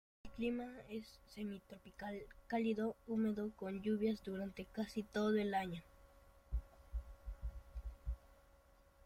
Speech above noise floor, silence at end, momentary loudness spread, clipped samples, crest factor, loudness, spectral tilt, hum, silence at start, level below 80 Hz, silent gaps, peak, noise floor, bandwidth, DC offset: 27 dB; 0.7 s; 15 LU; under 0.1%; 16 dB; -43 LUFS; -7 dB/octave; none; 0.25 s; -54 dBFS; none; -26 dBFS; -68 dBFS; 15.5 kHz; under 0.1%